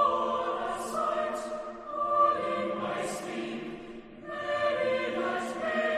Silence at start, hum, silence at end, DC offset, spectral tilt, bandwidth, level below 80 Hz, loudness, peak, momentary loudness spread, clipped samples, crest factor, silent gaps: 0 s; none; 0 s; under 0.1%; -4 dB/octave; 14.5 kHz; -64 dBFS; -31 LUFS; -14 dBFS; 13 LU; under 0.1%; 16 dB; none